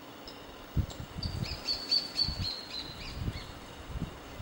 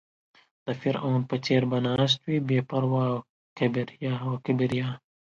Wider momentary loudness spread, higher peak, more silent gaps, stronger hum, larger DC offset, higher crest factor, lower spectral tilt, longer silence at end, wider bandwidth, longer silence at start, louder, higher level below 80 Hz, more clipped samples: first, 18 LU vs 7 LU; second, -18 dBFS vs -10 dBFS; second, none vs 3.29-3.56 s; neither; neither; about the same, 20 dB vs 16 dB; second, -4 dB/octave vs -7 dB/octave; second, 0 s vs 0.25 s; first, 16 kHz vs 7.4 kHz; second, 0 s vs 0.65 s; second, -34 LUFS vs -27 LUFS; first, -44 dBFS vs -64 dBFS; neither